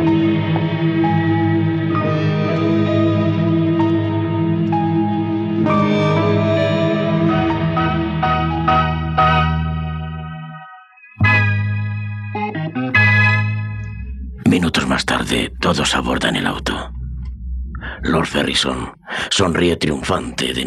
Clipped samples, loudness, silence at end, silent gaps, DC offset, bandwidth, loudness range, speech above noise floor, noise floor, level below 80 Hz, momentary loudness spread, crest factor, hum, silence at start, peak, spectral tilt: under 0.1%; -17 LUFS; 0 s; none; under 0.1%; 12.5 kHz; 3 LU; 24 dB; -42 dBFS; -34 dBFS; 12 LU; 14 dB; none; 0 s; -2 dBFS; -5.5 dB/octave